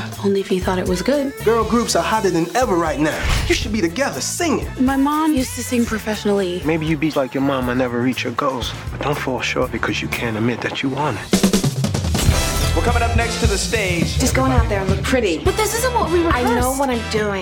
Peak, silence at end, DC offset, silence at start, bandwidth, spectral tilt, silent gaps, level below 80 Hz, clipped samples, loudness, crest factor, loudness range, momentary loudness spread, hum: -2 dBFS; 0 s; under 0.1%; 0 s; 17.5 kHz; -4.5 dB/octave; none; -30 dBFS; under 0.1%; -19 LUFS; 16 dB; 3 LU; 4 LU; none